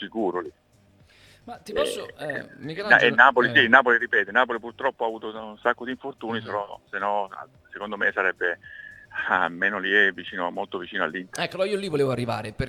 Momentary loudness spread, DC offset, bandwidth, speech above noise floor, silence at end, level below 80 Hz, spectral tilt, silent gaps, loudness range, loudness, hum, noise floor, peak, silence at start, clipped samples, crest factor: 19 LU; under 0.1%; 15.5 kHz; 33 dB; 0 s; -58 dBFS; -4.5 dB/octave; none; 9 LU; -23 LUFS; none; -57 dBFS; 0 dBFS; 0 s; under 0.1%; 24 dB